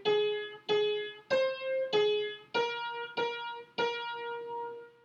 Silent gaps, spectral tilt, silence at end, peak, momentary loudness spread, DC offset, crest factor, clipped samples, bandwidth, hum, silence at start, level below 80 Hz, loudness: none; -3.5 dB/octave; 0.15 s; -16 dBFS; 10 LU; under 0.1%; 16 dB; under 0.1%; 7.4 kHz; none; 0 s; -82 dBFS; -33 LUFS